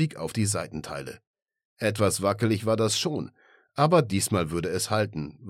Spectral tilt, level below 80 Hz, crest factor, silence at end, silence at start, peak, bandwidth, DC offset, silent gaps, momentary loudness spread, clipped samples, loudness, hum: -4.5 dB/octave; -56 dBFS; 20 dB; 0 s; 0 s; -8 dBFS; 16 kHz; under 0.1%; 1.27-1.34 s, 1.65-1.77 s; 14 LU; under 0.1%; -26 LUFS; none